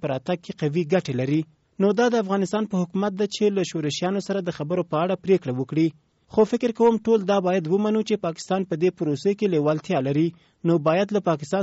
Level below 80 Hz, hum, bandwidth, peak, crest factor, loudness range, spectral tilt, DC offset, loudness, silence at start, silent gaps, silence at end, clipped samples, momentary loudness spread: -64 dBFS; none; 8 kHz; -8 dBFS; 14 dB; 2 LU; -6 dB/octave; under 0.1%; -23 LUFS; 0 s; none; 0 s; under 0.1%; 6 LU